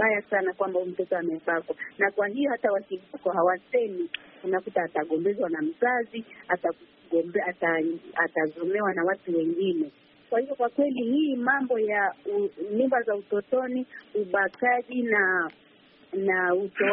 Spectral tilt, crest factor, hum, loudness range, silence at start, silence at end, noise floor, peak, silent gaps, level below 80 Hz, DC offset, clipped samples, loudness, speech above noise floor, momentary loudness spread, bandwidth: -3.5 dB/octave; 18 dB; none; 2 LU; 0 s; 0 s; -57 dBFS; -8 dBFS; none; -76 dBFS; under 0.1%; under 0.1%; -27 LUFS; 30 dB; 7 LU; 4.2 kHz